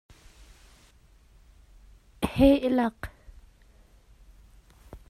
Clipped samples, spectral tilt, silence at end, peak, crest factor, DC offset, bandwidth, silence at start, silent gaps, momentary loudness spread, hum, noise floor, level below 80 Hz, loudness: under 0.1%; -7 dB/octave; 0.1 s; -8 dBFS; 24 dB; under 0.1%; 14.5 kHz; 2.2 s; none; 22 LU; none; -57 dBFS; -46 dBFS; -24 LUFS